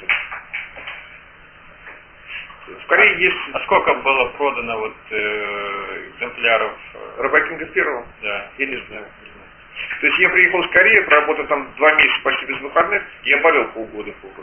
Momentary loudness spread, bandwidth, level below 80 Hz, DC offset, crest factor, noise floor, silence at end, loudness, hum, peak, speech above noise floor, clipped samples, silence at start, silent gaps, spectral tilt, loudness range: 20 LU; 3.4 kHz; -52 dBFS; under 0.1%; 20 dB; -44 dBFS; 0 s; -16 LUFS; none; 0 dBFS; 26 dB; under 0.1%; 0 s; none; -6 dB/octave; 7 LU